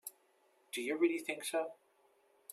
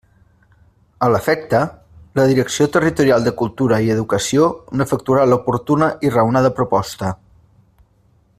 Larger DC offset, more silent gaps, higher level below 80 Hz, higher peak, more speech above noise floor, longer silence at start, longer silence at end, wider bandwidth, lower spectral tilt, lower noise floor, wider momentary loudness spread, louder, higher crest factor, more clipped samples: neither; neither; second, under -90 dBFS vs -48 dBFS; second, -20 dBFS vs -2 dBFS; second, 36 dB vs 40 dB; second, 0.05 s vs 1 s; second, 0.8 s vs 1.25 s; about the same, 15 kHz vs 15.5 kHz; second, -2 dB/octave vs -6 dB/octave; first, -72 dBFS vs -56 dBFS; first, 15 LU vs 7 LU; second, -37 LUFS vs -17 LUFS; about the same, 20 dB vs 16 dB; neither